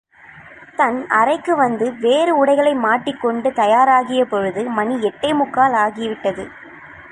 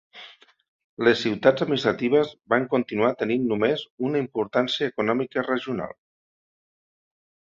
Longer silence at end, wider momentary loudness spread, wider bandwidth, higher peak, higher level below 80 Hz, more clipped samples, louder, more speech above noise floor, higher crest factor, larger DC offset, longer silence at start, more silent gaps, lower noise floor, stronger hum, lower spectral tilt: second, 0.05 s vs 1.65 s; first, 9 LU vs 6 LU; first, 11 kHz vs 7.6 kHz; about the same, -2 dBFS vs -2 dBFS; first, -58 dBFS vs -66 dBFS; neither; first, -17 LUFS vs -24 LUFS; about the same, 26 dB vs 25 dB; second, 16 dB vs 22 dB; neither; first, 0.35 s vs 0.15 s; second, none vs 0.68-0.97 s, 3.90-3.98 s; second, -42 dBFS vs -48 dBFS; neither; about the same, -5 dB/octave vs -6 dB/octave